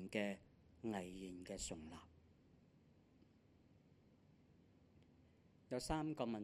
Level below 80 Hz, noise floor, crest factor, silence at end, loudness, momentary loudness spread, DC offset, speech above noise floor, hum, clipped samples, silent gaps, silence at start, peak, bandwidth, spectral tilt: -68 dBFS; -71 dBFS; 26 dB; 0 s; -47 LUFS; 12 LU; under 0.1%; 25 dB; none; under 0.1%; none; 0 s; -26 dBFS; 13.5 kHz; -4.5 dB/octave